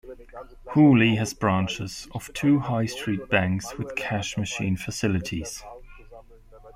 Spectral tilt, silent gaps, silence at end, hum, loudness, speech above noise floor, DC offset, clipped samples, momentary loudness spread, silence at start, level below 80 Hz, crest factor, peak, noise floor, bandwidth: -5.5 dB/octave; none; 0.05 s; none; -24 LUFS; 24 dB; under 0.1%; under 0.1%; 18 LU; 0.05 s; -50 dBFS; 18 dB; -6 dBFS; -48 dBFS; 15.5 kHz